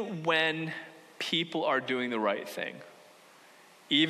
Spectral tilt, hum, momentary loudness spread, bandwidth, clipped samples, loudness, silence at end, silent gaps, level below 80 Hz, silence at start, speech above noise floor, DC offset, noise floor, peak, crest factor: -4.5 dB/octave; none; 13 LU; 13.5 kHz; under 0.1%; -30 LUFS; 0 s; none; -84 dBFS; 0 s; 25 dB; under 0.1%; -57 dBFS; -12 dBFS; 20 dB